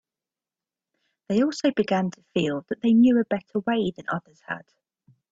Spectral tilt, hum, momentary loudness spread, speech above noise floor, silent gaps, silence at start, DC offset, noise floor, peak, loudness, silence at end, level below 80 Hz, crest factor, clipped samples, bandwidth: -6.5 dB/octave; none; 15 LU; over 67 dB; none; 1.3 s; under 0.1%; under -90 dBFS; -10 dBFS; -24 LUFS; 0.75 s; -66 dBFS; 16 dB; under 0.1%; 7.8 kHz